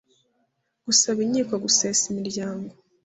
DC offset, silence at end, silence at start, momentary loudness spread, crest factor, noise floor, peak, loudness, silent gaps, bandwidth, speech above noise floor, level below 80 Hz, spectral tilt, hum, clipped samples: under 0.1%; 0.35 s; 0.85 s; 17 LU; 20 dB; -72 dBFS; -6 dBFS; -22 LUFS; none; 8.4 kHz; 49 dB; -66 dBFS; -2 dB/octave; none; under 0.1%